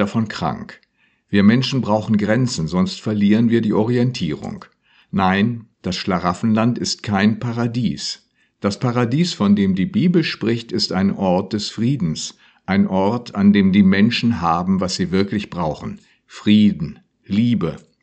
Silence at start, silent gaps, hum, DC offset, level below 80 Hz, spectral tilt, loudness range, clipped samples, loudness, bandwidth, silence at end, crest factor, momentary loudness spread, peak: 0 s; none; none; under 0.1%; -50 dBFS; -6 dB/octave; 3 LU; under 0.1%; -18 LUFS; 8.6 kHz; 0.25 s; 18 dB; 12 LU; 0 dBFS